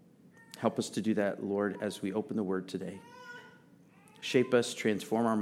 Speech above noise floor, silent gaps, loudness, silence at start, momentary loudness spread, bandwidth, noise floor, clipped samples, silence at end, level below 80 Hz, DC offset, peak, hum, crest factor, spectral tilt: 28 dB; none; -33 LUFS; 0.4 s; 19 LU; 15.5 kHz; -60 dBFS; under 0.1%; 0 s; -82 dBFS; under 0.1%; -12 dBFS; none; 20 dB; -5 dB/octave